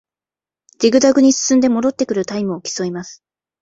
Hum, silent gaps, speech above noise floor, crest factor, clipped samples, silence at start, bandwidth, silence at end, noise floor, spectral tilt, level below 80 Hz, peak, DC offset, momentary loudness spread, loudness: none; none; over 75 dB; 16 dB; under 0.1%; 0.8 s; 8 kHz; 0.5 s; under -90 dBFS; -4 dB/octave; -58 dBFS; -2 dBFS; under 0.1%; 12 LU; -16 LUFS